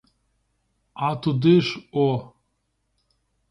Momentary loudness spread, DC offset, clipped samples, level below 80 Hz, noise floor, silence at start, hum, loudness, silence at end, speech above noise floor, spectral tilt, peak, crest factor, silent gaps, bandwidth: 10 LU; under 0.1%; under 0.1%; -62 dBFS; -73 dBFS; 0.95 s; none; -22 LUFS; 1.25 s; 52 dB; -8 dB/octave; -6 dBFS; 20 dB; none; 10.5 kHz